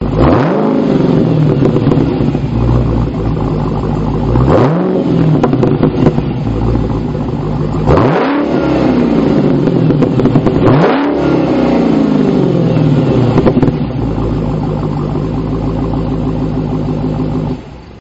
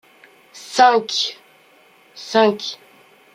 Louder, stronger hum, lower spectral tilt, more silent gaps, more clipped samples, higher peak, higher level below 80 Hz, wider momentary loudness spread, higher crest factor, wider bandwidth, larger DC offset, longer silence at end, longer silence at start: first, -12 LUFS vs -18 LUFS; neither; first, -8 dB/octave vs -2.5 dB/octave; neither; neither; about the same, 0 dBFS vs -2 dBFS; first, -24 dBFS vs -72 dBFS; second, 6 LU vs 23 LU; second, 10 dB vs 20 dB; second, 7.8 kHz vs 14.5 kHz; neither; second, 0 s vs 0.6 s; second, 0 s vs 0.55 s